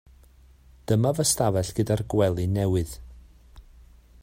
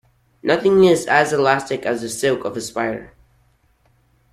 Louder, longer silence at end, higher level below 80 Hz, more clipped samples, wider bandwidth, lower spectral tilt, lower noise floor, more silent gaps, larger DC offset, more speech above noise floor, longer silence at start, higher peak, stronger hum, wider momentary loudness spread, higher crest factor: second, -24 LUFS vs -18 LUFS; second, 0.6 s vs 1.25 s; first, -46 dBFS vs -56 dBFS; neither; first, 16 kHz vs 14.5 kHz; about the same, -5.5 dB/octave vs -4.5 dB/octave; second, -53 dBFS vs -59 dBFS; neither; neither; second, 30 dB vs 42 dB; first, 0.9 s vs 0.45 s; second, -8 dBFS vs -2 dBFS; neither; about the same, 11 LU vs 12 LU; about the same, 18 dB vs 18 dB